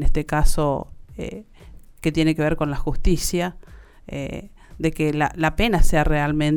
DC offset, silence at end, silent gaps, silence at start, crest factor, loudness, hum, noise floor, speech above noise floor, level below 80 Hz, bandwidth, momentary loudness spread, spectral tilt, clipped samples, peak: under 0.1%; 0 s; none; 0 s; 16 dB; -23 LUFS; none; -43 dBFS; 24 dB; -24 dBFS; 17.5 kHz; 14 LU; -5.5 dB/octave; under 0.1%; -4 dBFS